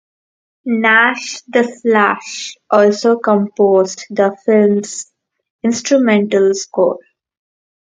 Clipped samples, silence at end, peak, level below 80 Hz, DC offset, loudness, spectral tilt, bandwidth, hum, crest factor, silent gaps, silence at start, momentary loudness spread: under 0.1%; 0.95 s; 0 dBFS; -66 dBFS; under 0.1%; -14 LUFS; -4.5 dB/octave; 9.4 kHz; none; 14 dB; 5.50-5.59 s; 0.65 s; 13 LU